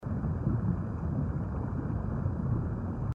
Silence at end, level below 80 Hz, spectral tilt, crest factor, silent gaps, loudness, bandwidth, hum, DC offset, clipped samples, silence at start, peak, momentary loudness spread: 0 s; -40 dBFS; -11.5 dB/octave; 14 dB; none; -33 LUFS; 2.8 kHz; none; under 0.1%; under 0.1%; 0 s; -18 dBFS; 3 LU